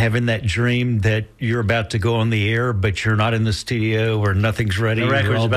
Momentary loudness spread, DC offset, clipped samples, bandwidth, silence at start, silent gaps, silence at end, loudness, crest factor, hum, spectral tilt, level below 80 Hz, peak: 3 LU; under 0.1%; under 0.1%; 12 kHz; 0 s; none; 0 s; -19 LUFS; 12 dB; none; -6.5 dB/octave; -42 dBFS; -8 dBFS